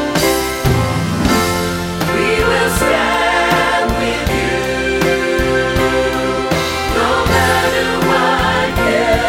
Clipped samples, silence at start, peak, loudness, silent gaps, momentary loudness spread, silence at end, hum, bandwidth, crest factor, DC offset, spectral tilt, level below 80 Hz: under 0.1%; 0 s; 0 dBFS; -14 LUFS; none; 4 LU; 0 s; none; 18.5 kHz; 14 dB; under 0.1%; -4.5 dB/octave; -28 dBFS